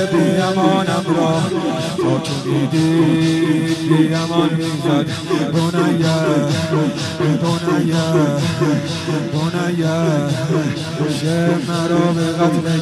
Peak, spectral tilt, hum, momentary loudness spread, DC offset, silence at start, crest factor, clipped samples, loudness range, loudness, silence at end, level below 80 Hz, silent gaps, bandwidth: -2 dBFS; -6 dB/octave; none; 5 LU; under 0.1%; 0 s; 14 dB; under 0.1%; 2 LU; -17 LUFS; 0 s; -52 dBFS; none; 13 kHz